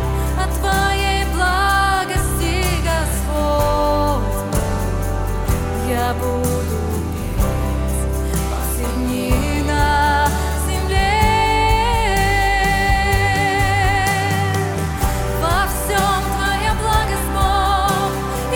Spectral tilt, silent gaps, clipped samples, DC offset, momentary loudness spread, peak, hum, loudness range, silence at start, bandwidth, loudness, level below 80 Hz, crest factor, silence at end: -4.5 dB/octave; none; under 0.1%; under 0.1%; 6 LU; -2 dBFS; none; 5 LU; 0 s; 18.5 kHz; -18 LUFS; -22 dBFS; 16 dB; 0 s